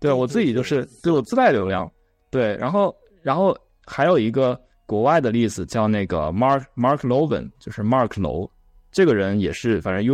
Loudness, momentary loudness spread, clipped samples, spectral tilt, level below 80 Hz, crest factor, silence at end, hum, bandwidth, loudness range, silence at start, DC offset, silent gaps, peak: -21 LUFS; 10 LU; under 0.1%; -7 dB/octave; -48 dBFS; 16 dB; 0 s; none; 13 kHz; 1 LU; 0 s; under 0.1%; none; -6 dBFS